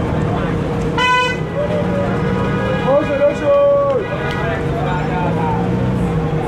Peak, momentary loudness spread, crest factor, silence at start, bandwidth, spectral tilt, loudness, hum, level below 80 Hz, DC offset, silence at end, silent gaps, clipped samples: -4 dBFS; 5 LU; 12 dB; 0 s; 11.5 kHz; -7 dB/octave; -17 LUFS; none; -32 dBFS; under 0.1%; 0 s; none; under 0.1%